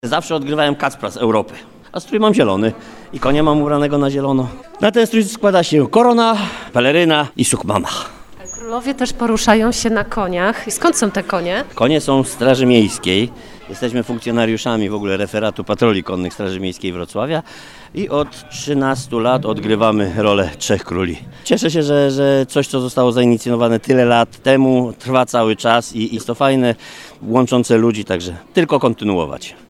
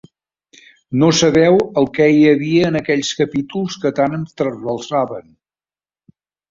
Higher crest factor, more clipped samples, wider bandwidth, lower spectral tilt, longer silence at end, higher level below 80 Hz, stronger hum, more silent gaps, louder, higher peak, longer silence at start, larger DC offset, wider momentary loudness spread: about the same, 16 dB vs 16 dB; neither; first, 15.5 kHz vs 7.6 kHz; about the same, -5 dB/octave vs -5.5 dB/octave; second, 0.15 s vs 1.3 s; first, -42 dBFS vs -52 dBFS; neither; neither; about the same, -16 LUFS vs -16 LUFS; about the same, 0 dBFS vs -2 dBFS; second, 0.05 s vs 0.9 s; neither; about the same, 10 LU vs 11 LU